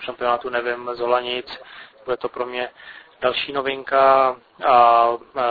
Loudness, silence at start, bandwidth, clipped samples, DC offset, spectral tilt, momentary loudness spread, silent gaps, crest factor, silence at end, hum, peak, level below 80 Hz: -20 LUFS; 0 s; 4.9 kHz; under 0.1%; under 0.1%; -6.5 dB/octave; 14 LU; none; 18 dB; 0 s; none; -2 dBFS; -58 dBFS